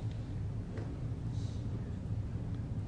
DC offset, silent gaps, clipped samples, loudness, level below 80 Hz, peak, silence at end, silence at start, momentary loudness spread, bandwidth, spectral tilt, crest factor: under 0.1%; none; under 0.1%; -40 LUFS; -46 dBFS; -26 dBFS; 0 s; 0 s; 2 LU; 9.6 kHz; -8.5 dB/octave; 12 dB